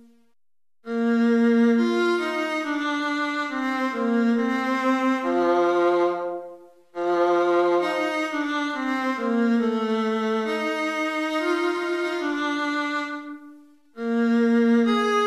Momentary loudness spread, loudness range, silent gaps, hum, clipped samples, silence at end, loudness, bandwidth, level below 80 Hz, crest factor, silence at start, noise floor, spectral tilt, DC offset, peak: 8 LU; 3 LU; none; none; under 0.1%; 0 s; -23 LUFS; 12 kHz; -74 dBFS; 12 dB; 0.85 s; under -90 dBFS; -5 dB/octave; under 0.1%; -10 dBFS